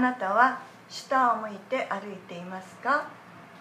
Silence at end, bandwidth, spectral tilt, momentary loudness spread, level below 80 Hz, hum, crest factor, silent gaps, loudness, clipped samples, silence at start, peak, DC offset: 0 s; 15 kHz; -4.5 dB/octave; 18 LU; -82 dBFS; none; 22 dB; none; -27 LUFS; under 0.1%; 0 s; -8 dBFS; under 0.1%